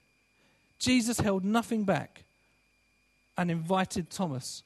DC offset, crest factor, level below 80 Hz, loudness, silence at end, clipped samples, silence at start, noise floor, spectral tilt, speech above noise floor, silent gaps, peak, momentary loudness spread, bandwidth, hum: under 0.1%; 20 dB; -60 dBFS; -30 LUFS; 0.05 s; under 0.1%; 0.8 s; -70 dBFS; -5 dB/octave; 40 dB; none; -12 dBFS; 8 LU; 13 kHz; none